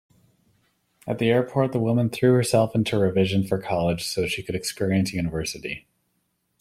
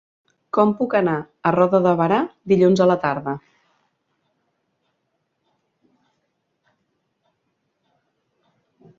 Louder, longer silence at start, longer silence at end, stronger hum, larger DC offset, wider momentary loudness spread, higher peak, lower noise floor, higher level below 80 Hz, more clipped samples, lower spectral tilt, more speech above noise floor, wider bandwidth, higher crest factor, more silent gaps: second, -23 LUFS vs -19 LUFS; first, 1.05 s vs 0.55 s; second, 0.8 s vs 5.6 s; neither; neither; about the same, 10 LU vs 9 LU; about the same, -6 dBFS vs -4 dBFS; about the same, -73 dBFS vs -73 dBFS; first, -52 dBFS vs -64 dBFS; neither; second, -6 dB/octave vs -8 dB/octave; second, 50 dB vs 55 dB; first, 15.5 kHz vs 7.6 kHz; about the same, 18 dB vs 20 dB; neither